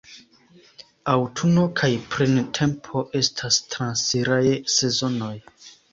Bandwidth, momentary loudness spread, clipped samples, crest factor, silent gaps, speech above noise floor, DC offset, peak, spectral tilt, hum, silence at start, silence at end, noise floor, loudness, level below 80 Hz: 8 kHz; 8 LU; under 0.1%; 18 dB; none; 26 dB; under 0.1%; -4 dBFS; -4 dB/octave; none; 0.1 s; 0.2 s; -49 dBFS; -22 LUFS; -56 dBFS